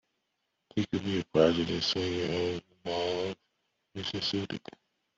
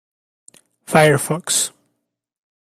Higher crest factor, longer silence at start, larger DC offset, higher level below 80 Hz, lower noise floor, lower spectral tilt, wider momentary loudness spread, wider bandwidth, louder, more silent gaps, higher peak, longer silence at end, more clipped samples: about the same, 22 dB vs 20 dB; second, 0.75 s vs 0.9 s; neither; about the same, -64 dBFS vs -60 dBFS; first, -81 dBFS vs -75 dBFS; first, -5.5 dB/octave vs -3.5 dB/octave; first, 14 LU vs 6 LU; second, 7.8 kHz vs 15.5 kHz; second, -31 LUFS vs -17 LUFS; neither; second, -10 dBFS vs 0 dBFS; second, 0.6 s vs 1.1 s; neither